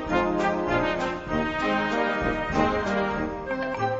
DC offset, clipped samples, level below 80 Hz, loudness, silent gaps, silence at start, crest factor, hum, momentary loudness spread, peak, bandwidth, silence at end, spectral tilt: under 0.1%; under 0.1%; -42 dBFS; -26 LUFS; none; 0 s; 18 dB; none; 5 LU; -8 dBFS; 8 kHz; 0 s; -6 dB/octave